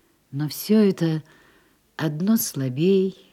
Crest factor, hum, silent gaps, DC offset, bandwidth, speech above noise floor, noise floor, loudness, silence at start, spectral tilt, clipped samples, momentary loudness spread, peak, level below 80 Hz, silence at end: 14 dB; none; none; under 0.1%; 16 kHz; 38 dB; -59 dBFS; -22 LUFS; 0.3 s; -6 dB/octave; under 0.1%; 11 LU; -8 dBFS; -70 dBFS; 0.2 s